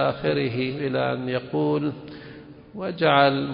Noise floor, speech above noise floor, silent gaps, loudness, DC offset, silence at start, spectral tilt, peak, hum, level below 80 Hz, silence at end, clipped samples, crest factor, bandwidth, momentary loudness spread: -43 dBFS; 20 dB; none; -24 LUFS; under 0.1%; 0 s; -11 dB/octave; -4 dBFS; none; -58 dBFS; 0 s; under 0.1%; 20 dB; 5.4 kHz; 22 LU